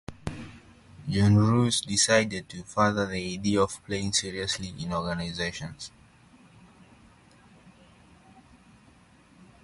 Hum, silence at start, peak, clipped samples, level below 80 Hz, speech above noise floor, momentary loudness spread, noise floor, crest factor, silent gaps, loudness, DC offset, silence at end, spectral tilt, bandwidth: none; 0.1 s; -8 dBFS; under 0.1%; -50 dBFS; 31 dB; 18 LU; -57 dBFS; 20 dB; none; -26 LUFS; under 0.1%; 0.2 s; -4.5 dB/octave; 11.5 kHz